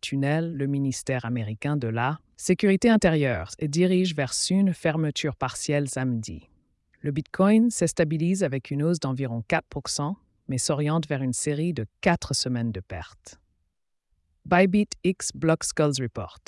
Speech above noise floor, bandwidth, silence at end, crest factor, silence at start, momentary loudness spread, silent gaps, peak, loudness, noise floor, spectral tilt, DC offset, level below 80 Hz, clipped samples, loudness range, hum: 50 dB; 12 kHz; 0.15 s; 16 dB; 0.05 s; 10 LU; none; -8 dBFS; -25 LUFS; -75 dBFS; -5.5 dB/octave; under 0.1%; -54 dBFS; under 0.1%; 4 LU; none